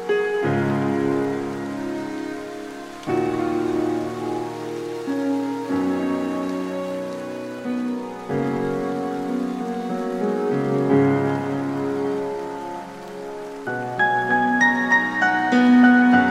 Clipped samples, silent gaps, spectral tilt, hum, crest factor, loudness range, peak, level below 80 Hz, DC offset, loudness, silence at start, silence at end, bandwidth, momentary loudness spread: under 0.1%; none; -6.5 dB/octave; none; 18 dB; 6 LU; -4 dBFS; -60 dBFS; under 0.1%; -22 LUFS; 0 s; 0 s; 12.5 kHz; 13 LU